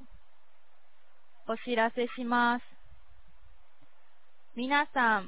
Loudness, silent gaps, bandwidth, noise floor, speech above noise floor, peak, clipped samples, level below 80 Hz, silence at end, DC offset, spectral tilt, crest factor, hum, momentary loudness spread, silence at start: -30 LUFS; none; 4 kHz; -69 dBFS; 40 dB; -14 dBFS; under 0.1%; -66 dBFS; 0 s; 0.8%; -1 dB/octave; 20 dB; none; 12 LU; 0.1 s